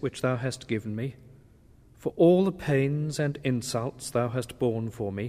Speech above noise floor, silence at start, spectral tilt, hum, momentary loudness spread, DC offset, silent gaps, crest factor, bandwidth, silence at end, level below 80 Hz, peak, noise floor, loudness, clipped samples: 29 dB; 0 s; -6.5 dB/octave; none; 12 LU; under 0.1%; none; 18 dB; 15.5 kHz; 0 s; -56 dBFS; -10 dBFS; -56 dBFS; -28 LUFS; under 0.1%